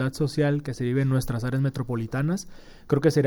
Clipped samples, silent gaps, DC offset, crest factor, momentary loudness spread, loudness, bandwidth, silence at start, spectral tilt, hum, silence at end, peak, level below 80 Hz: under 0.1%; none; under 0.1%; 16 dB; 6 LU; -26 LUFS; 17.5 kHz; 0 s; -7 dB/octave; none; 0 s; -8 dBFS; -46 dBFS